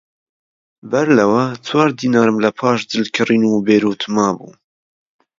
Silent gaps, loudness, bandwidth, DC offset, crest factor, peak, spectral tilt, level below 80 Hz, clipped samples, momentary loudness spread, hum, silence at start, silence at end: none; -15 LUFS; 7.6 kHz; under 0.1%; 16 dB; 0 dBFS; -5.5 dB/octave; -60 dBFS; under 0.1%; 6 LU; none; 0.85 s; 0.95 s